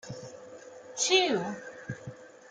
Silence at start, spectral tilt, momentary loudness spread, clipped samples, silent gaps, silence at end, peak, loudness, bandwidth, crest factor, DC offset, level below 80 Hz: 0.05 s; -2.5 dB/octave; 24 LU; under 0.1%; none; 0.05 s; -10 dBFS; -27 LUFS; 9.8 kHz; 22 dB; under 0.1%; -72 dBFS